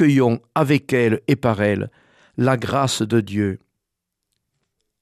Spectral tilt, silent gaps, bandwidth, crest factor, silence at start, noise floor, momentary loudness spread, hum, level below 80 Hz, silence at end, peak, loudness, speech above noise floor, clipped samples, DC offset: -6 dB/octave; none; 14 kHz; 16 dB; 0 s; -80 dBFS; 8 LU; none; -56 dBFS; 1.45 s; -4 dBFS; -20 LUFS; 62 dB; under 0.1%; under 0.1%